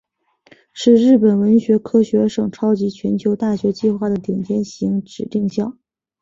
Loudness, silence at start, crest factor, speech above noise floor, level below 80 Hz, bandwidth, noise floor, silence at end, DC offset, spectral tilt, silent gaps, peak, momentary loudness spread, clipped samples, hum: -17 LUFS; 0.75 s; 16 dB; 37 dB; -56 dBFS; 7.6 kHz; -53 dBFS; 0.5 s; under 0.1%; -7.5 dB/octave; none; -2 dBFS; 9 LU; under 0.1%; none